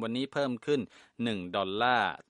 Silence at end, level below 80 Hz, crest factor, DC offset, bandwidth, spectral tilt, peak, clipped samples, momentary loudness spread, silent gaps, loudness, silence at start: 0.15 s; -70 dBFS; 20 dB; under 0.1%; 11 kHz; -5.5 dB/octave; -12 dBFS; under 0.1%; 8 LU; none; -31 LUFS; 0 s